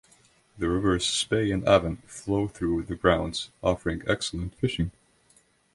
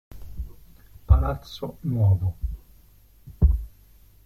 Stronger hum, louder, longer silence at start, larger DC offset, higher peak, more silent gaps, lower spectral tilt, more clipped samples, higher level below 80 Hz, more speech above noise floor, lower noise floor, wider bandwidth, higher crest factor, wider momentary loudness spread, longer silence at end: neither; about the same, -27 LUFS vs -25 LUFS; first, 0.55 s vs 0.1 s; neither; about the same, -4 dBFS vs -4 dBFS; neither; second, -5 dB/octave vs -9 dB/octave; neither; second, -44 dBFS vs -28 dBFS; first, 37 dB vs 29 dB; first, -63 dBFS vs -53 dBFS; second, 11.5 kHz vs 13.5 kHz; about the same, 22 dB vs 20 dB; second, 9 LU vs 20 LU; first, 0.85 s vs 0.6 s